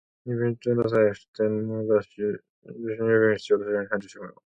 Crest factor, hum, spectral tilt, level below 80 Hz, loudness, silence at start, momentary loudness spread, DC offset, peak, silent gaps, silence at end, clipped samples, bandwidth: 16 dB; none; -7.5 dB/octave; -64 dBFS; -25 LUFS; 0.25 s; 15 LU; under 0.1%; -10 dBFS; 1.28-1.33 s, 2.50-2.62 s; 0.3 s; under 0.1%; 7.8 kHz